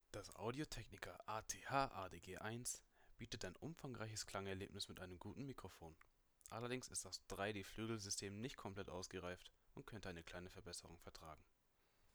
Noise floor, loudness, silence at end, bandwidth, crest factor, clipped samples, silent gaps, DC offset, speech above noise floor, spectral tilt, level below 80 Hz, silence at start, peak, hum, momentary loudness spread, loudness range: -79 dBFS; -50 LUFS; 0.05 s; over 20 kHz; 24 dB; under 0.1%; none; under 0.1%; 28 dB; -3.5 dB/octave; -68 dBFS; 0.15 s; -26 dBFS; none; 13 LU; 5 LU